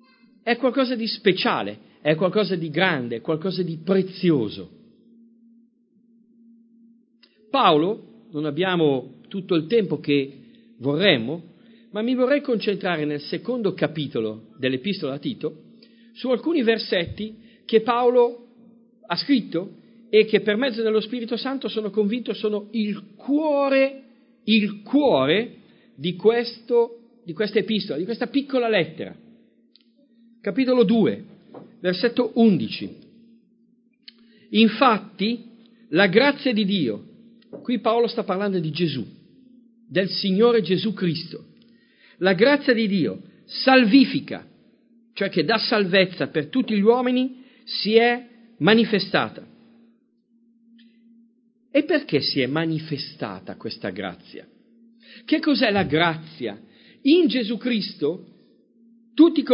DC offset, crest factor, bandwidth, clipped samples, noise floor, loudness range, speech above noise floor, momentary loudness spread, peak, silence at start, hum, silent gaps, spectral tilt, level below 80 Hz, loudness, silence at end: under 0.1%; 22 dB; 5.4 kHz; under 0.1%; -63 dBFS; 5 LU; 41 dB; 15 LU; 0 dBFS; 0.45 s; none; none; -10 dB/octave; -64 dBFS; -22 LUFS; 0 s